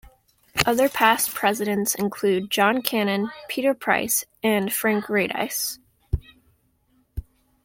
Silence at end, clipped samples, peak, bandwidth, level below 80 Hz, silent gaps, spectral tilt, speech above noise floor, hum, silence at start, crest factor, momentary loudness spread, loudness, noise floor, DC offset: 0.4 s; under 0.1%; 0 dBFS; 17 kHz; -42 dBFS; none; -3.5 dB/octave; 42 dB; none; 0.55 s; 24 dB; 13 LU; -22 LUFS; -65 dBFS; under 0.1%